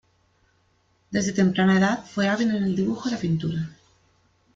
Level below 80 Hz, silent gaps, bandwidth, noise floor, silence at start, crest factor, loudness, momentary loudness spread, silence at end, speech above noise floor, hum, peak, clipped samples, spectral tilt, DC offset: -60 dBFS; none; 7.6 kHz; -65 dBFS; 1.1 s; 16 dB; -23 LUFS; 10 LU; 0.8 s; 43 dB; none; -8 dBFS; under 0.1%; -6 dB/octave; under 0.1%